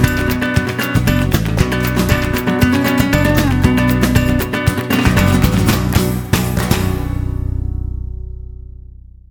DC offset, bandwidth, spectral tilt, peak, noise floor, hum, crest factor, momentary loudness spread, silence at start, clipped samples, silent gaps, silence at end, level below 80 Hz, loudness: under 0.1%; 20 kHz; -5.5 dB/octave; 0 dBFS; -36 dBFS; none; 14 dB; 11 LU; 0 s; under 0.1%; none; 0.35 s; -24 dBFS; -15 LUFS